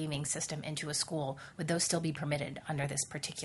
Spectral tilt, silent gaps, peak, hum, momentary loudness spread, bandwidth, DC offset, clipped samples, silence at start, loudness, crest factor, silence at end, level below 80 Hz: -3.5 dB/octave; none; -16 dBFS; none; 7 LU; 11.5 kHz; under 0.1%; under 0.1%; 0 s; -35 LUFS; 20 dB; 0 s; -66 dBFS